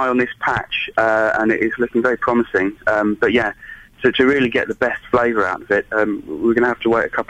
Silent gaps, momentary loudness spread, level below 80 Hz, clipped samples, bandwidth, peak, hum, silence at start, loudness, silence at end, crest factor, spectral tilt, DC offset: none; 5 LU; -48 dBFS; under 0.1%; 8.8 kHz; -2 dBFS; none; 0 s; -18 LUFS; 0.05 s; 16 dB; -6 dB/octave; under 0.1%